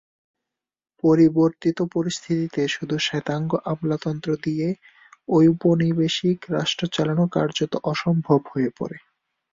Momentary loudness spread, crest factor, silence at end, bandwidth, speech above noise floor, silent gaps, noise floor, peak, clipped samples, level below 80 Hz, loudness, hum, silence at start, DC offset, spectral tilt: 9 LU; 18 dB; 0.55 s; 7.8 kHz; 64 dB; none; -86 dBFS; -4 dBFS; under 0.1%; -60 dBFS; -22 LUFS; none; 1.05 s; under 0.1%; -6 dB/octave